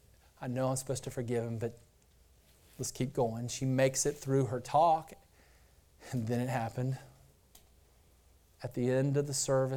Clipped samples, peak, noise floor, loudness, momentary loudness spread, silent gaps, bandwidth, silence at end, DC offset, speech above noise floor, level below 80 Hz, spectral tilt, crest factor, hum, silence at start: under 0.1%; -16 dBFS; -64 dBFS; -33 LUFS; 12 LU; none; 17.5 kHz; 0 s; under 0.1%; 32 dB; -62 dBFS; -5.5 dB/octave; 18 dB; none; 0.4 s